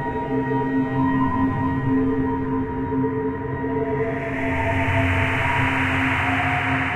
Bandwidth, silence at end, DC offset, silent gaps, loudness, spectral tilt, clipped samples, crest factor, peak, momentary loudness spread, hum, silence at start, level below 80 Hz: 9.6 kHz; 0 s; under 0.1%; none; -22 LUFS; -7.5 dB/octave; under 0.1%; 14 dB; -6 dBFS; 5 LU; none; 0 s; -40 dBFS